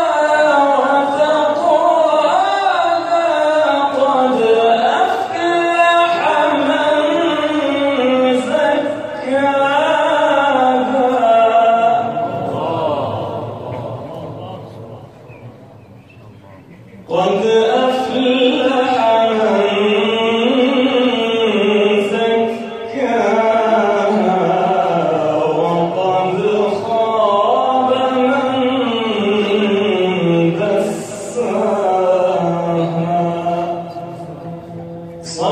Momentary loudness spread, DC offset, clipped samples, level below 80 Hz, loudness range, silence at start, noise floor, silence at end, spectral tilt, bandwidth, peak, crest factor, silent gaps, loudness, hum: 11 LU; under 0.1%; under 0.1%; -58 dBFS; 7 LU; 0 s; -40 dBFS; 0 s; -5.5 dB/octave; 10.5 kHz; 0 dBFS; 14 dB; none; -15 LUFS; none